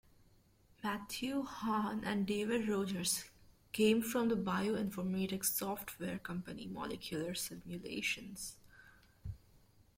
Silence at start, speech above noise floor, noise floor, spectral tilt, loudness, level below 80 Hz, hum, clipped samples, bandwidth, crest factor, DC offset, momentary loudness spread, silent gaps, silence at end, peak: 0.8 s; 30 dB; -68 dBFS; -4 dB/octave; -38 LUFS; -64 dBFS; none; under 0.1%; 16.5 kHz; 18 dB; under 0.1%; 13 LU; none; 0.6 s; -20 dBFS